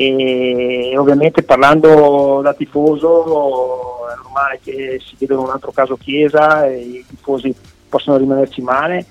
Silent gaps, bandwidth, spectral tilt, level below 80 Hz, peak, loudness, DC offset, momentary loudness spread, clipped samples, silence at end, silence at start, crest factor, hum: none; 10.5 kHz; -6.5 dB/octave; -50 dBFS; 0 dBFS; -13 LUFS; under 0.1%; 15 LU; under 0.1%; 0.05 s; 0 s; 14 dB; none